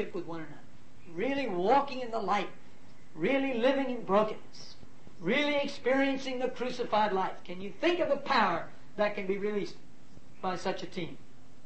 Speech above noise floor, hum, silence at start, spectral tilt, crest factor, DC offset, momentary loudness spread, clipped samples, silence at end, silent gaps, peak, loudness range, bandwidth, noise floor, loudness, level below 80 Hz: 26 dB; none; 0 s; -5.5 dB/octave; 20 dB; 1%; 15 LU; under 0.1%; 0.4 s; none; -12 dBFS; 3 LU; 8.6 kHz; -57 dBFS; -31 LUFS; -66 dBFS